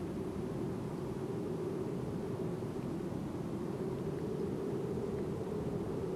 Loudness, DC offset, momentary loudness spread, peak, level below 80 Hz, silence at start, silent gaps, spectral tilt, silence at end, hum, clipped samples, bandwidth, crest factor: -39 LUFS; under 0.1%; 2 LU; -26 dBFS; -58 dBFS; 0 s; none; -8 dB/octave; 0 s; none; under 0.1%; 15 kHz; 12 dB